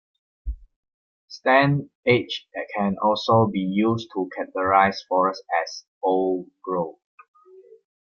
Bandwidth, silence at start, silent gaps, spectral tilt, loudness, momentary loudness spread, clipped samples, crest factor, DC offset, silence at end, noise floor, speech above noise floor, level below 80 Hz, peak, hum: 7.2 kHz; 0.45 s; 0.76-0.83 s, 0.94-1.28 s, 1.95-2.03 s, 5.88-6.01 s; -6.5 dB/octave; -23 LUFS; 15 LU; under 0.1%; 22 dB; under 0.1%; 1.15 s; -50 dBFS; 28 dB; -46 dBFS; -2 dBFS; none